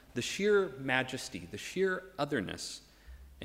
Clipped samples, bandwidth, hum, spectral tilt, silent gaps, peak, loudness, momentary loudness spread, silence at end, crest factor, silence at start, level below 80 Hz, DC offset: under 0.1%; 16 kHz; none; -4 dB/octave; none; -14 dBFS; -34 LUFS; 13 LU; 0 s; 22 dB; 0.1 s; -60 dBFS; under 0.1%